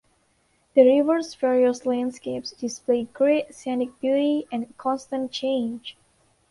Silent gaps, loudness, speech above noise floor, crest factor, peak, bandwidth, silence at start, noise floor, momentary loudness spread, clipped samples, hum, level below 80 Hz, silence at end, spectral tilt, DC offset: none; -23 LUFS; 43 dB; 20 dB; -4 dBFS; 11.5 kHz; 0.75 s; -66 dBFS; 14 LU; under 0.1%; none; -68 dBFS; 0.6 s; -4.5 dB/octave; under 0.1%